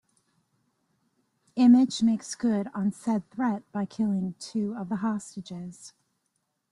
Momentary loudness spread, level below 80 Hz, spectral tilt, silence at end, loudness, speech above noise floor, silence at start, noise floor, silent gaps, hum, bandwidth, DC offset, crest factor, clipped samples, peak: 18 LU; -70 dBFS; -6 dB/octave; 0.85 s; -26 LUFS; 52 dB; 1.55 s; -78 dBFS; none; none; 11.5 kHz; under 0.1%; 18 dB; under 0.1%; -10 dBFS